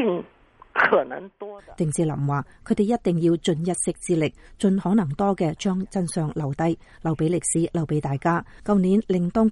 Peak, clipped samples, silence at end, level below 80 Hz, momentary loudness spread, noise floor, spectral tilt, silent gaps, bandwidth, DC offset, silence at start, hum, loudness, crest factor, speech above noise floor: -6 dBFS; under 0.1%; 0 s; -50 dBFS; 8 LU; -53 dBFS; -6 dB/octave; none; 11.5 kHz; under 0.1%; 0 s; none; -24 LUFS; 16 dB; 30 dB